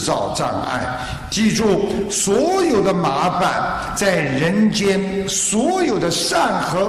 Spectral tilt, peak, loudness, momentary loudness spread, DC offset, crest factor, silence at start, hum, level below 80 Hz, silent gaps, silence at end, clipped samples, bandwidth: -4 dB/octave; -4 dBFS; -18 LUFS; 5 LU; under 0.1%; 14 dB; 0 s; none; -42 dBFS; none; 0 s; under 0.1%; 13 kHz